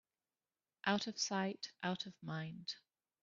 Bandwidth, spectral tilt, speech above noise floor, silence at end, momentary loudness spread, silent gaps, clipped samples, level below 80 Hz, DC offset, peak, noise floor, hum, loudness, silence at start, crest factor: 7.4 kHz; -3 dB/octave; over 49 dB; 0.45 s; 9 LU; none; under 0.1%; -84 dBFS; under 0.1%; -20 dBFS; under -90 dBFS; none; -41 LUFS; 0.85 s; 24 dB